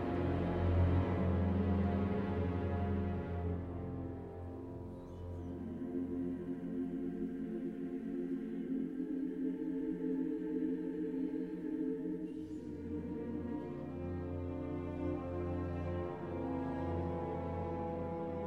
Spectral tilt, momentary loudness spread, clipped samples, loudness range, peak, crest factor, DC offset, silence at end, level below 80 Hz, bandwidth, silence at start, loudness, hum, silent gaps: -10 dB/octave; 10 LU; under 0.1%; 7 LU; -22 dBFS; 16 dB; under 0.1%; 0 s; -52 dBFS; 4.8 kHz; 0 s; -39 LUFS; none; none